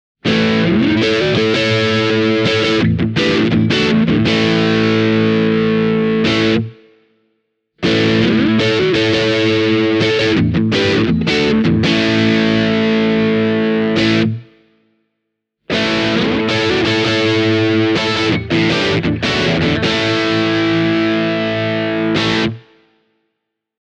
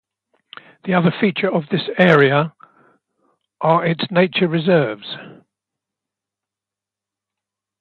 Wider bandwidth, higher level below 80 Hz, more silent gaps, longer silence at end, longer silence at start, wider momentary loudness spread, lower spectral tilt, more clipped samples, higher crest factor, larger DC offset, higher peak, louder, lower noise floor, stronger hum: first, 9 kHz vs 5.6 kHz; first, -42 dBFS vs -64 dBFS; neither; second, 1.2 s vs 2.45 s; second, 0.25 s vs 0.85 s; second, 3 LU vs 14 LU; second, -6 dB/octave vs -8.5 dB/octave; neither; second, 14 dB vs 20 dB; neither; about the same, 0 dBFS vs 0 dBFS; first, -14 LUFS vs -17 LUFS; second, -75 dBFS vs -87 dBFS; neither